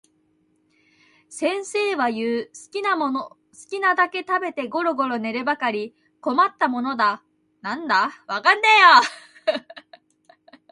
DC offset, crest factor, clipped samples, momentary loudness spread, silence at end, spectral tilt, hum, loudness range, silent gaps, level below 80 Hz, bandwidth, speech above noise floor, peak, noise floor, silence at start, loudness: under 0.1%; 22 dB; under 0.1%; 16 LU; 0.9 s; -2.5 dB/octave; none; 8 LU; none; -76 dBFS; 11.5 kHz; 44 dB; 0 dBFS; -65 dBFS; 1.3 s; -20 LUFS